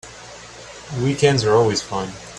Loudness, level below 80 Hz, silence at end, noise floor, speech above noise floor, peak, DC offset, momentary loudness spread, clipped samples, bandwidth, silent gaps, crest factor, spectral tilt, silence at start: -19 LUFS; -48 dBFS; 0 s; -39 dBFS; 20 dB; 0 dBFS; under 0.1%; 21 LU; under 0.1%; 11 kHz; none; 20 dB; -5 dB/octave; 0.05 s